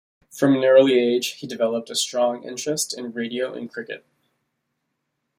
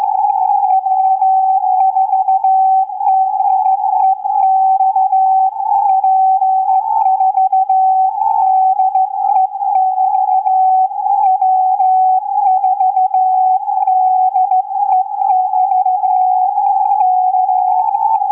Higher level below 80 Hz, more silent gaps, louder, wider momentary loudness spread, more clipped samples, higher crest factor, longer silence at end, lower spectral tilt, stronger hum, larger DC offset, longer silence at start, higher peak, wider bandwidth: first, -70 dBFS vs -78 dBFS; neither; second, -21 LUFS vs -13 LUFS; first, 18 LU vs 3 LU; neither; first, 20 dB vs 8 dB; first, 1.4 s vs 0 s; about the same, -3.5 dB/octave vs -4 dB/octave; neither; neither; first, 0.35 s vs 0 s; about the same, -4 dBFS vs -4 dBFS; first, 16 kHz vs 2.6 kHz